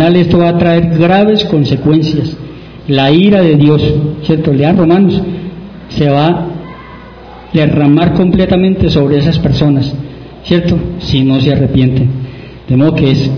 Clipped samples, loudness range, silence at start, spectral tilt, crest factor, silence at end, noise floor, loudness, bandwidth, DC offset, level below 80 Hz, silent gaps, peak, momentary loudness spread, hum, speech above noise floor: 0.9%; 3 LU; 0 s; -8.5 dB/octave; 10 dB; 0 s; -31 dBFS; -10 LUFS; 5.4 kHz; under 0.1%; -30 dBFS; none; 0 dBFS; 15 LU; none; 22 dB